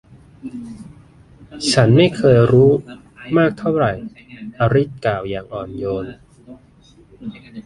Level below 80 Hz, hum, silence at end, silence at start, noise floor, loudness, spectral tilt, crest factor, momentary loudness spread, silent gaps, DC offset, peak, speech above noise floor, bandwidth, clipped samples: -46 dBFS; none; 0.05 s; 0.45 s; -49 dBFS; -16 LUFS; -6.5 dB/octave; 16 dB; 23 LU; none; under 0.1%; -2 dBFS; 32 dB; 11.5 kHz; under 0.1%